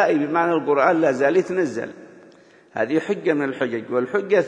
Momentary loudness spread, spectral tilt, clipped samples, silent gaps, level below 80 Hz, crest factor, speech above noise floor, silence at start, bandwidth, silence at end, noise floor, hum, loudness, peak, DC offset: 8 LU; -6.5 dB/octave; under 0.1%; none; -72 dBFS; 18 dB; 30 dB; 0 s; 9.8 kHz; 0 s; -50 dBFS; none; -21 LUFS; -4 dBFS; under 0.1%